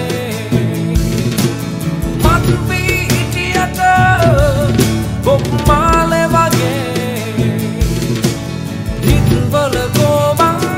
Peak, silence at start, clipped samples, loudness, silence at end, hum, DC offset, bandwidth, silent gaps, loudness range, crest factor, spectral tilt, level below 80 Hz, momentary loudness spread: 0 dBFS; 0 s; under 0.1%; -13 LUFS; 0 s; none; under 0.1%; 16.5 kHz; none; 3 LU; 12 dB; -5.5 dB/octave; -24 dBFS; 8 LU